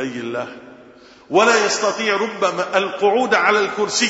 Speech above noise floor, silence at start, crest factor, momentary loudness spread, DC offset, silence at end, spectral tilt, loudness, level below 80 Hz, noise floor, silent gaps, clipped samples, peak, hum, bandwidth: 27 dB; 0 s; 18 dB; 11 LU; under 0.1%; 0 s; -2.5 dB/octave; -18 LUFS; -64 dBFS; -45 dBFS; none; under 0.1%; 0 dBFS; none; 8 kHz